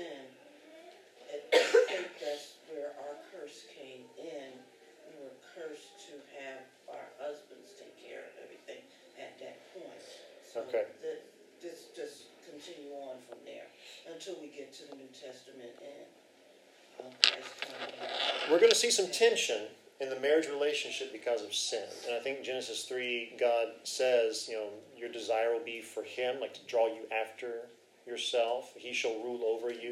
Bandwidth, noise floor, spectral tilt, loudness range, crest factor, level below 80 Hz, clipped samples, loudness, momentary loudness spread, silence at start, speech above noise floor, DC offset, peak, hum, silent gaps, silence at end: 15.5 kHz; -61 dBFS; -0.5 dB/octave; 19 LU; 36 dB; under -90 dBFS; under 0.1%; -33 LUFS; 24 LU; 0 s; 28 dB; under 0.1%; 0 dBFS; none; none; 0 s